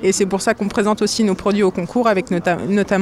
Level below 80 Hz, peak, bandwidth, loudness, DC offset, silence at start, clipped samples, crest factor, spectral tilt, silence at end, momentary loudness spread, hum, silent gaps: -48 dBFS; -4 dBFS; 14 kHz; -18 LUFS; under 0.1%; 0 s; under 0.1%; 14 dB; -5 dB/octave; 0 s; 2 LU; none; none